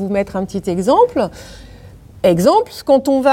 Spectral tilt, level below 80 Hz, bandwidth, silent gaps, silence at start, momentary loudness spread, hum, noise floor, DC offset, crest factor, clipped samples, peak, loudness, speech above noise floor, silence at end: -6 dB/octave; -44 dBFS; 16.5 kHz; none; 0 s; 9 LU; none; -39 dBFS; under 0.1%; 14 dB; under 0.1%; 0 dBFS; -15 LUFS; 24 dB; 0 s